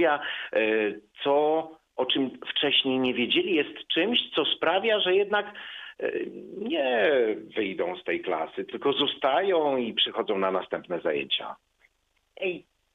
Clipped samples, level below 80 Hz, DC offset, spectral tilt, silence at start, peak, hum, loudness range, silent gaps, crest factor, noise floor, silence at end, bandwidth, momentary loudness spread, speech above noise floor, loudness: under 0.1%; -72 dBFS; under 0.1%; -6 dB/octave; 0 s; -10 dBFS; none; 4 LU; none; 16 dB; -72 dBFS; 0.35 s; 4.9 kHz; 10 LU; 45 dB; -26 LUFS